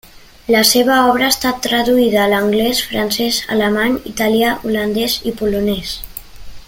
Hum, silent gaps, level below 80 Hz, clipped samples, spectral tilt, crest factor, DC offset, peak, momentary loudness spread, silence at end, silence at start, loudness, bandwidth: none; none; -40 dBFS; under 0.1%; -3 dB/octave; 16 dB; under 0.1%; 0 dBFS; 8 LU; 0.05 s; 0.15 s; -15 LUFS; 17 kHz